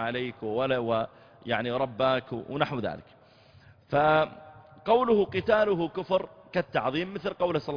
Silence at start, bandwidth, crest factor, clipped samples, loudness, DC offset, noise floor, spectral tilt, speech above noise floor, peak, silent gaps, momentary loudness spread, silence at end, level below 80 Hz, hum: 0 s; 5.2 kHz; 18 dB; under 0.1%; -28 LUFS; under 0.1%; -56 dBFS; -7.5 dB/octave; 29 dB; -10 dBFS; none; 10 LU; 0 s; -60 dBFS; none